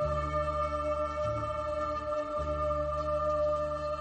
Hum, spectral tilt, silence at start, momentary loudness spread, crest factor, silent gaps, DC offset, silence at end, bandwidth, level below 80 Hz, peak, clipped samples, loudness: 50 Hz at -60 dBFS; -7 dB/octave; 0 s; 4 LU; 12 dB; none; under 0.1%; 0 s; 8.8 kHz; -42 dBFS; -20 dBFS; under 0.1%; -32 LUFS